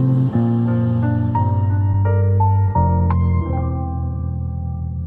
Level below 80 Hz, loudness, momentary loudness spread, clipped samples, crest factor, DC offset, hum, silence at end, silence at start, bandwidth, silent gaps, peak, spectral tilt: -30 dBFS; -18 LUFS; 8 LU; under 0.1%; 12 dB; under 0.1%; none; 0 s; 0 s; 3.2 kHz; none; -6 dBFS; -12.5 dB/octave